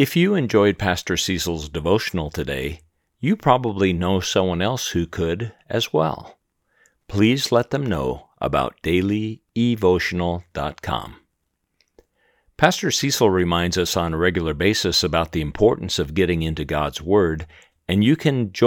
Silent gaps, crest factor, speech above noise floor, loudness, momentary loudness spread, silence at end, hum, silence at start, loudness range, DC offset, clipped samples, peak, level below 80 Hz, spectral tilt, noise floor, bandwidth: none; 22 dB; 54 dB; -21 LUFS; 10 LU; 0 s; none; 0 s; 4 LU; under 0.1%; under 0.1%; 0 dBFS; -44 dBFS; -5 dB/octave; -74 dBFS; 19.5 kHz